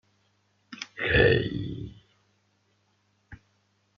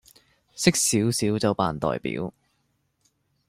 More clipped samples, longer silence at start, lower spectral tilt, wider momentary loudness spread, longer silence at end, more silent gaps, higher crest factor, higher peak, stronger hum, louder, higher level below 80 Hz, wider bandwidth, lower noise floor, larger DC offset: neither; first, 0.7 s vs 0.55 s; about the same, -4 dB/octave vs -4 dB/octave; first, 22 LU vs 11 LU; second, 0.65 s vs 1.2 s; neither; about the same, 22 dB vs 24 dB; second, -8 dBFS vs -2 dBFS; neither; about the same, -25 LUFS vs -24 LUFS; first, -46 dBFS vs -56 dBFS; second, 7.2 kHz vs 16 kHz; about the same, -70 dBFS vs -71 dBFS; neither